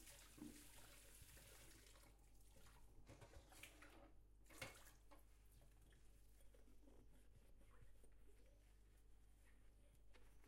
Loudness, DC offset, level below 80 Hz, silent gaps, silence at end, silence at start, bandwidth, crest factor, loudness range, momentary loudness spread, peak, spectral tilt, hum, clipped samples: -63 LUFS; under 0.1%; -70 dBFS; none; 0 s; 0 s; 16 kHz; 26 dB; 2 LU; 9 LU; -38 dBFS; -3.5 dB/octave; none; under 0.1%